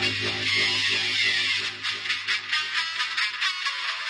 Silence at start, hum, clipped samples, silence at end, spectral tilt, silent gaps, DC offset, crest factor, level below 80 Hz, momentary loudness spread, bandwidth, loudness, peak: 0 s; none; under 0.1%; 0 s; -1 dB/octave; none; under 0.1%; 16 dB; -66 dBFS; 5 LU; 10.5 kHz; -23 LUFS; -10 dBFS